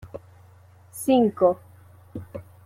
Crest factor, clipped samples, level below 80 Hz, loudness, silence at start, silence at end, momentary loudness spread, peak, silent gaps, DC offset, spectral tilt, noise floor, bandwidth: 18 dB; under 0.1%; -60 dBFS; -22 LUFS; 0.05 s; 0.25 s; 22 LU; -8 dBFS; none; under 0.1%; -6 dB/octave; -52 dBFS; 16 kHz